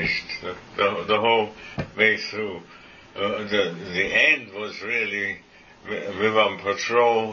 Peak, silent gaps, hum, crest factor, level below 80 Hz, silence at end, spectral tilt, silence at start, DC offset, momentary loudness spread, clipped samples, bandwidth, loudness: -4 dBFS; none; none; 20 dB; -56 dBFS; 0 s; -4 dB/octave; 0 s; under 0.1%; 14 LU; under 0.1%; 7.2 kHz; -23 LUFS